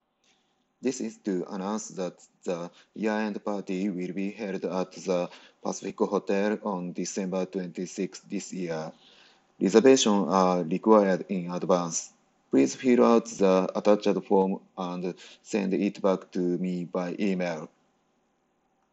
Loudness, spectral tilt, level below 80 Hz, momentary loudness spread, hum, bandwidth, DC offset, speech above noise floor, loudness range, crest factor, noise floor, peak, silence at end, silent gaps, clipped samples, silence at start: -27 LUFS; -5.5 dB/octave; -74 dBFS; 14 LU; none; 8.4 kHz; under 0.1%; 45 dB; 8 LU; 22 dB; -72 dBFS; -6 dBFS; 1.25 s; none; under 0.1%; 0.8 s